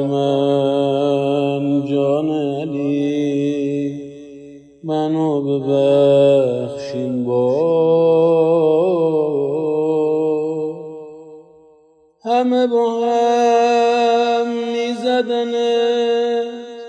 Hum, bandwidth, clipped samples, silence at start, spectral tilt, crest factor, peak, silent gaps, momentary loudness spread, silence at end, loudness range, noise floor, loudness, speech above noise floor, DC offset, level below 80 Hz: none; 8.6 kHz; under 0.1%; 0 s; -6.5 dB/octave; 14 dB; -4 dBFS; none; 10 LU; 0 s; 5 LU; -53 dBFS; -17 LUFS; 37 dB; under 0.1%; -64 dBFS